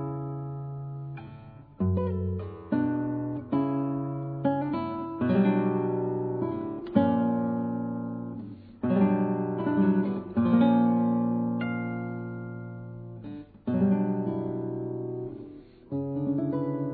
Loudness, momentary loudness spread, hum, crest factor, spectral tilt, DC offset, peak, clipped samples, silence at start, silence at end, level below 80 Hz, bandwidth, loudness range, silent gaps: -28 LUFS; 15 LU; none; 18 dB; -12.5 dB/octave; under 0.1%; -10 dBFS; under 0.1%; 0 s; 0 s; -60 dBFS; 4.6 kHz; 6 LU; none